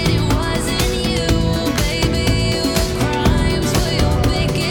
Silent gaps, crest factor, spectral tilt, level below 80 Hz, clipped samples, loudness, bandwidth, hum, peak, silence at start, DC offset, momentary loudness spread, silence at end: none; 14 dB; -5 dB/octave; -24 dBFS; under 0.1%; -17 LUFS; 18 kHz; none; -2 dBFS; 0 s; under 0.1%; 2 LU; 0 s